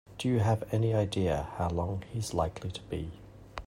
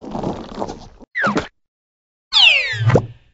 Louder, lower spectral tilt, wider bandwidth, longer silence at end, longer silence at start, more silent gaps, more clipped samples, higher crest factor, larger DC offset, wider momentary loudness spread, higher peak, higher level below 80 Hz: second, -32 LUFS vs -15 LUFS; first, -6.5 dB/octave vs -2 dB/octave; first, 15.5 kHz vs 8 kHz; second, 0 s vs 0.2 s; about the same, 0.1 s vs 0 s; second, none vs 1.68-2.31 s; neither; about the same, 16 dB vs 18 dB; neither; second, 12 LU vs 19 LU; second, -14 dBFS vs 0 dBFS; second, -50 dBFS vs -44 dBFS